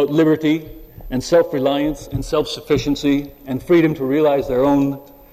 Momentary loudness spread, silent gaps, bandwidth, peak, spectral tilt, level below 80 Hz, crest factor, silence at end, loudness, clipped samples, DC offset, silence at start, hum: 11 LU; none; 15 kHz; -4 dBFS; -6.5 dB/octave; -40 dBFS; 12 dB; 0.3 s; -18 LUFS; under 0.1%; under 0.1%; 0 s; none